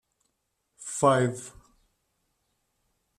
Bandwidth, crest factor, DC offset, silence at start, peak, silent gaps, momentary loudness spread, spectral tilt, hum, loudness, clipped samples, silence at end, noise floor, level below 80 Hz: 14 kHz; 24 dB; under 0.1%; 0.8 s; -8 dBFS; none; 20 LU; -5 dB/octave; none; -25 LUFS; under 0.1%; 1.7 s; -78 dBFS; -66 dBFS